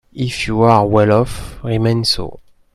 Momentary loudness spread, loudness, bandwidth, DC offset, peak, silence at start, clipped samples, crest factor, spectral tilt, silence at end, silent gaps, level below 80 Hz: 11 LU; -15 LUFS; 13.5 kHz; under 0.1%; 0 dBFS; 0.15 s; under 0.1%; 16 dB; -6 dB/octave; 0.35 s; none; -36 dBFS